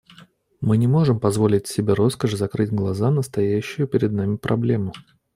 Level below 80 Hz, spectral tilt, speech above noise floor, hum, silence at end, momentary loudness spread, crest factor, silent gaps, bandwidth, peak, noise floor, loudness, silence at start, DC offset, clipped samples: -54 dBFS; -7.5 dB/octave; 31 dB; none; 0.35 s; 5 LU; 16 dB; none; 15.5 kHz; -4 dBFS; -51 dBFS; -21 LUFS; 0.2 s; under 0.1%; under 0.1%